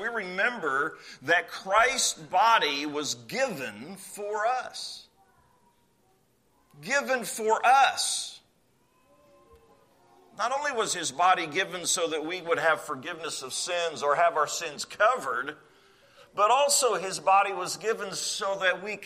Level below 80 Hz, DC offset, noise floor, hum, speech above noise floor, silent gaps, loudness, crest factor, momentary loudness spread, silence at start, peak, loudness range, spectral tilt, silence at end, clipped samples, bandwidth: -70 dBFS; under 0.1%; -67 dBFS; none; 40 dB; none; -26 LUFS; 20 dB; 13 LU; 0 s; -8 dBFS; 7 LU; -1 dB/octave; 0 s; under 0.1%; 15 kHz